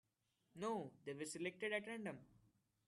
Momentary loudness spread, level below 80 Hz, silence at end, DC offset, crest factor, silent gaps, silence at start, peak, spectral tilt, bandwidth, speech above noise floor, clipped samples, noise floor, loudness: 9 LU; -86 dBFS; 0.6 s; under 0.1%; 20 dB; none; 0.55 s; -28 dBFS; -4 dB/octave; 12.5 kHz; 38 dB; under 0.1%; -85 dBFS; -47 LUFS